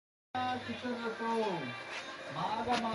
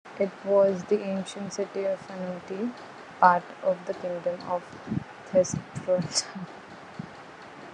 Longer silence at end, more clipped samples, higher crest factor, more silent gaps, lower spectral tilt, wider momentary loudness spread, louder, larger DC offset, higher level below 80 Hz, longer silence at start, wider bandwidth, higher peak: about the same, 0 s vs 0 s; neither; second, 18 dB vs 24 dB; neither; about the same, -4.5 dB/octave vs -4.5 dB/octave; second, 8 LU vs 20 LU; second, -37 LUFS vs -28 LUFS; neither; about the same, -68 dBFS vs -70 dBFS; first, 0.35 s vs 0.05 s; about the same, 11.5 kHz vs 11 kHz; second, -20 dBFS vs -4 dBFS